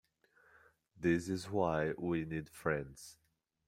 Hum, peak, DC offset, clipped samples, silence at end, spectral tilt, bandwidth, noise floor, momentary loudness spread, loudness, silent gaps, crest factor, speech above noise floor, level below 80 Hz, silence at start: none; -18 dBFS; under 0.1%; under 0.1%; 0.55 s; -6.5 dB/octave; 16 kHz; -70 dBFS; 14 LU; -37 LUFS; none; 20 dB; 34 dB; -64 dBFS; 0.95 s